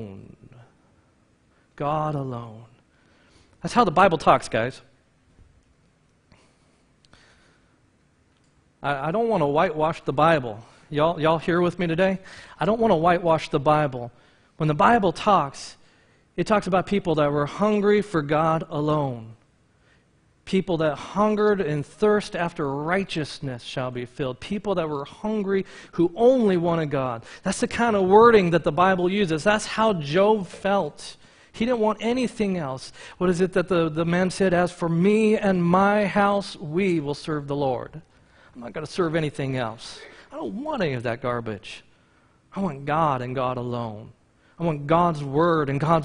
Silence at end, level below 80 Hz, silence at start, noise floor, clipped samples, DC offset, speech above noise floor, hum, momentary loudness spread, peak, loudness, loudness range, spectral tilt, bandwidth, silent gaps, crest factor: 0 s; -52 dBFS; 0 s; -62 dBFS; under 0.1%; under 0.1%; 40 dB; none; 14 LU; -2 dBFS; -23 LUFS; 9 LU; -6.5 dB/octave; 10.5 kHz; none; 22 dB